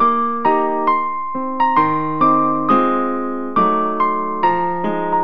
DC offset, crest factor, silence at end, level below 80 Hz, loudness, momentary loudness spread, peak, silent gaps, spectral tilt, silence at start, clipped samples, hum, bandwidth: 3%; 16 dB; 0 s; -62 dBFS; -17 LUFS; 6 LU; 0 dBFS; none; -8.5 dB/octave; 0 s; under 0.1%; none; 5.6 kHz